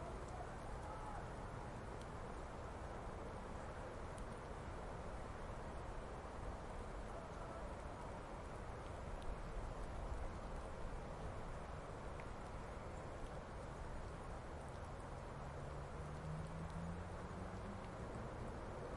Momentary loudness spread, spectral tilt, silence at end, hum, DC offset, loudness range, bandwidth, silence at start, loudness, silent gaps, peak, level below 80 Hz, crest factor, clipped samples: 2 LU; -6.5 dB/octave; 0 s; none; under 0.1%; 1 LU; 11.5 kHz; 0 s; -51 LUFS; none; -34 dBFS; -54 dBFS; 16 dB; under 0.1%